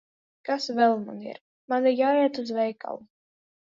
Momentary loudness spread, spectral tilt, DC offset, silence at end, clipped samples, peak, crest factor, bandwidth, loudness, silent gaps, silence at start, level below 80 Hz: 18 LU; -5 dB/octave; under 0.1%; 0.7 s; under 0.1%; -8 dBFS; 18 dB; 7.6 kHz; -25 LUFS; 1.41-1.68 s; 0.45 s; -80 dBFS